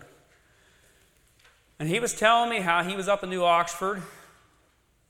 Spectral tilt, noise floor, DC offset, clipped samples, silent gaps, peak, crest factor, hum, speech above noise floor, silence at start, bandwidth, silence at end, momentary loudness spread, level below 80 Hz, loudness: -3.5 dB/octave; -65 dBFS; under 0.1%; under 0.1%; none; -6 dBFS; 24 dB; none; 41 dB; 1.8 s; 16.5 kHz; 0.9 s; 12 LU; -62 dBFS; -25 LUFS